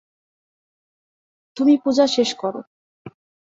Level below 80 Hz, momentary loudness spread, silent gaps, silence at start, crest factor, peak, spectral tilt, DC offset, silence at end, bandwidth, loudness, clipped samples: -68 dBFS; 17 LU; 2.67-3.05 s; 1.55 s; 18 dB; -4 dBFS; -4 dB/octave; under 0.1%; 0.45 s; 7.8 kHz; -19 LUFS; under 0.1%